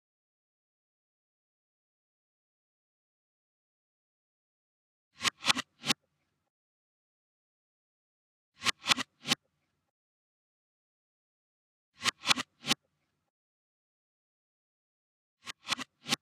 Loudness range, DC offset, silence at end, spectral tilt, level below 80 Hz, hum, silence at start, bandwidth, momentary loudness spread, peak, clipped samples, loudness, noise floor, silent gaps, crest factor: 6 LU; under 0.1%; 0.05 s; -0.5 dB/octave; -78 dBFS; none; 5.2 s; 15.5 kHz; 8 LU; -6 dBFS; under 0.1%; -31 LUFS; -80 dBFS; 6.50-8.52 s, 9.90-11.92 s, 13.30-15.37 s; 34 dB